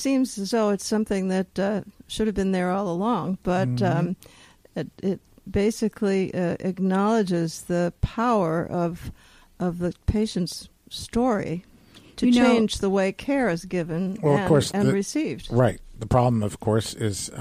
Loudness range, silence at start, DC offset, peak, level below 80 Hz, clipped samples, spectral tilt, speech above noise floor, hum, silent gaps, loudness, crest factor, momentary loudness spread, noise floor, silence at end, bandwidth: 4 LU; 0 s; under 0.1%; -8 dBFS; -44 dBFS; under 0.1%; -6 dB/octave; 27 dB; none; none; -24 LUFS; 16 dB; 10 LU; -50 dBFS; 0 s; 15.5 kHz